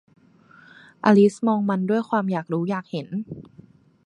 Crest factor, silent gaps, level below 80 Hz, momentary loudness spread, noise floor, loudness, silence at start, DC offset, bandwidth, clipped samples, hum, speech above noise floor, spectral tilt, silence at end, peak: 20 dB; none; -66 dBFS; 15 LU; -53 dBFS; -22 LUFS; 1.05 s; under 0.1%; 10 kHz; under 0.1%; none; 31 dB; -7.5 dB/octave; 0.65 s; -4 dBFS